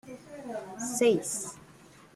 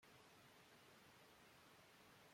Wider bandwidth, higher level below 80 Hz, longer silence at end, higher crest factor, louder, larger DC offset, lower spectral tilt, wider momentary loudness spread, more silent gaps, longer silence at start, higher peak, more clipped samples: about the same, 15 kHz vs 16.5 kHz; first, -70 dBFS vs under -90 dBFS; about the same, 0.1 s vs 0 s; first, 20 dB vs 14 dB; first, -30 LUFS vs -67 LUFS; neither; about the same, -3.5 dB/octave vs -3 dB/octave; first, 19 LU vs 0 LU; neither; about the same, 0.05 s vs 0 s; first, -12 dBFS vs -54 dBFS; neither